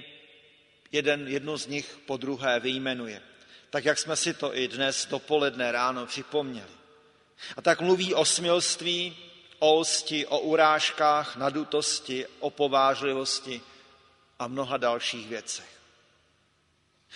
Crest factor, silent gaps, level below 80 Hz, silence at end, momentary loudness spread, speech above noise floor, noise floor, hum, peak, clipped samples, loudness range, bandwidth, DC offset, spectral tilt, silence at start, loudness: 22 dB; none; -74 dBFS; 0 s; 13 LU; 41 dB; -68 dBFS; none; -6 dBFS; under 0.1%; 6 LU; 11 kHz; under 0.1%; -2.5 dB/octave; 0 s; -27 LUFS